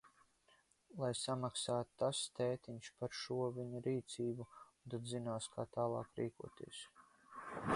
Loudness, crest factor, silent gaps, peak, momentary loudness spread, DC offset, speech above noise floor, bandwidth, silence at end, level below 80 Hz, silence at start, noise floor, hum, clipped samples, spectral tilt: -43 LUFS; 20 dB; none; -24 dBFS; 14 LU; under 0.1%; 31 dB; 11.5 kHz; 0 s; -74 dBFS; 0.05 s; -74 dBFS; none; under 0.1%; -4.5 dB/octave